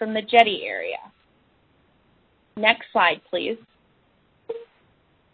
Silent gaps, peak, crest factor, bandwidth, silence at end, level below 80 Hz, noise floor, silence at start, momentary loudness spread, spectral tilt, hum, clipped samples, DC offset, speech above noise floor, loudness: none; 0 dBFS; 26 dB; 8 kHz; 0.7 s; -68 dBFS; -62 dBFS; 0 s; 20 LU; -5 dB/octave; none; under 0.1%; under 0.1%; 41 dB; -21 LUFS